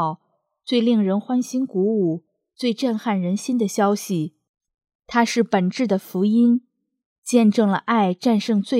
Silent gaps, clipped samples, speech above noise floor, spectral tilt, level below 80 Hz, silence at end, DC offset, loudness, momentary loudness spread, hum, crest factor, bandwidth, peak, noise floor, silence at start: 4.49-4.54 s, 4.74-4.78 s, 4.95-4.99 s, 7.06-7.22 s; under 0.1%; 50 dB; -6 dB/octave; -70 dBFS; 0 s; under 0.1%; -21 LUFS; 9 LU; none; 16 dB; 15.5 kHz; -4 dBFS; -69 dBFS; 0 s